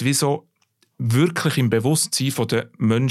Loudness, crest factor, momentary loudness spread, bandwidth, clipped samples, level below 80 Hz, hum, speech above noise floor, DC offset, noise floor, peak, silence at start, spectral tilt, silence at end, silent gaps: -21 LUFS; 16 dB; 5 LU; 15.5 kHz; under 0.1%; -62 dBFS; none; 45 dB; under 0.1%; -65 dBFS; -6 dBFS; 0 s; -5 dB/octave; 0 s; none